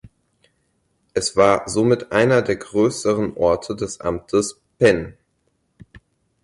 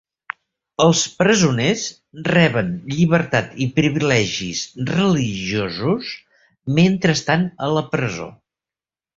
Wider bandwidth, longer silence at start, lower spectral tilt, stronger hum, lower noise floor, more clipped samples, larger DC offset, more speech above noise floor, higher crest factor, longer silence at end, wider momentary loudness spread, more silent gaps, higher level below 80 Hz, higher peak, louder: first, 11.5 kHz vs 7.8 kHz; second, 0.05 s vs 0.8 s; about the same, -5 dB/octave vs -5 dB/octave; neither; second, -68 dBFS vs under -90 dBFS; neither; neither; second, 50 dB vs over 72 dB; about the same, 18 dB vs 18 dB; second, 0.45 s vs 0.85 s; second, 10 LU vs 16 LU; neither; about the same, -48 dBFS vs -50 dBFS; about the same, -2 dBFS vs -2 dBFS; about the same, -19 LUFS vs -19 LUFS